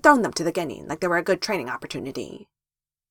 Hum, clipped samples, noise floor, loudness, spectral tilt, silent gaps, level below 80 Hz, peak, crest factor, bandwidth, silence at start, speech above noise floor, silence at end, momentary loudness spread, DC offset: none; under 0.1%; under -90 dBFS; -25 LUFS; -4 dB/octave; none; -58 dBFS; 0 dBFS; 24 dB; 17.5 kHz; 0.05 s; over 67 dB; 0.7 s; 14 LU; under 0.1%